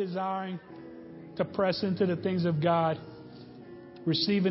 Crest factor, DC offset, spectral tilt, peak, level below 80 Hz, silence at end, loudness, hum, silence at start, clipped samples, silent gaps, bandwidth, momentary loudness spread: 16 dB; under 0.1%; -10 dB/octave; -14 dBFS; -66 dBFS; 0 s; -29 LUFS; none; 0 s; under 0.1%; none; 5.8 kHz; 21 LU